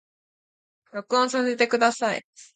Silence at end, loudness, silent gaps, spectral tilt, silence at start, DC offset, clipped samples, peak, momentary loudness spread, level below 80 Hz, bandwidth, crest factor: 0.1 s; -23 LUFS; 2.24-2.33 s; -2.5 dB/octave; 0.95 s; under 0.1%; under 0.1%; -6 dBFS; 14 LU; -76 dBFS; 9.4 kHz; 20 dB